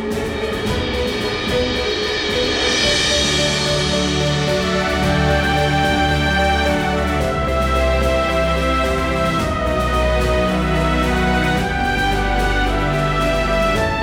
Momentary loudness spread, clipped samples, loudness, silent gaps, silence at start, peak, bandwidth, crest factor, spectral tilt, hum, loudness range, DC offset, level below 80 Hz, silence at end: 4 LU; under 0.1%; -17 LUFS; none; 0 s; -4 dBFS; 18 kHz; 14 dB; -4.5 dB/octave; none; 1 LU; under 0.1%; -26 dBFS; 0 s